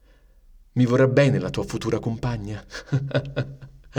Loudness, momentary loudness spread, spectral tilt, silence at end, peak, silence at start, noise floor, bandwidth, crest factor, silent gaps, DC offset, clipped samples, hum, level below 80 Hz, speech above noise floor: -23 LUFS; 14 LU; -7 dB/octave; 0 s; -6 dBFS; 0.75 s; -53 dBFS; 10.5 kHz; 18 dB; none; under 0.1%; under 0.1%; none; -46 dBFS; 31 dB